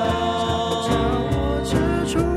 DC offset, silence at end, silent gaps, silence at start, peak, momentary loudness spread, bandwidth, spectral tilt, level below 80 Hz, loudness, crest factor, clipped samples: under 0.1%; 0 s; none; 0 s; -6 dBFS; 1 LU; 14.5 kHz; -6 dB/octave; -32 dBFS; -22 LUFS; 14 dB; under 0.1%